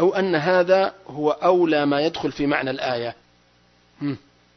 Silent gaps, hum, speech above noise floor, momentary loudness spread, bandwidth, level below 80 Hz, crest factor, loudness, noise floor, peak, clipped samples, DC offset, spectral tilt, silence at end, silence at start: none; 60 Hz at -55 dBFS; 38 dB; 12 LU; 6.4 kHz; -58 dBFS; 18 dB; -21 LUFS; -58 dBFS; -4 dBFS; under 0.1%; under 0.1%; -6.5 dB/octave; 0.4 s; 0 s